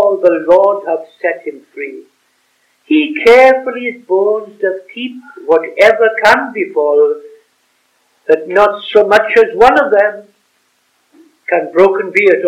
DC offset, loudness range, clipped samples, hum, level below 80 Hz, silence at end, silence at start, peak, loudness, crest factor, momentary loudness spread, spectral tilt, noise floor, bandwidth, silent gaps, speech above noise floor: under 0.1%; 2 LU; 1%; none; -50 dBFS; 0 s; 0 s; 0 dBFS; -11 LUFS; 12 dB; 17 LU; -4.5 dB/octave; -59 dBFS; 12.5 kHz; none; 48 dB